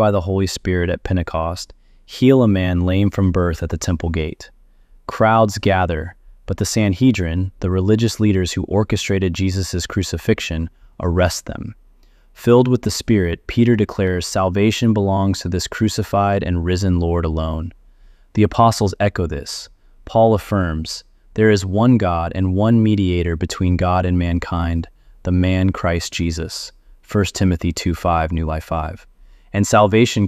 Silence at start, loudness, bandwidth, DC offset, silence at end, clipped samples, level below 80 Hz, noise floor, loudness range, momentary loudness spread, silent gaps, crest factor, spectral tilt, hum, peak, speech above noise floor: 0 s; -18 LUFS; 15 kHz; under 0.1%; 0 s; under 0.1%; -34 dBFS; -49 dBFS; 3 LU; 12 LU; none; 16 dB; -6 dB/octave; none; -2 dBFS; 32 dB